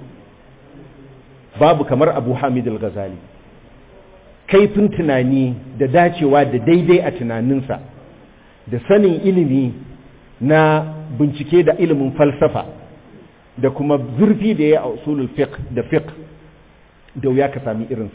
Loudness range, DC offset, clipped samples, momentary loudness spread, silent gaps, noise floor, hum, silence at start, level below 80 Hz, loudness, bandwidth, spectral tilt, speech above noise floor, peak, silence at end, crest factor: 4 LU; under 0.1%; under 0.1%; 11 LU; none; -47 dBFS; none; 0 s; -46 dBFS; -16 LUFS; 4 kHz; -11.5 dB/octave; 32 dB; -4 dBFS; 0.05 s; 14 dB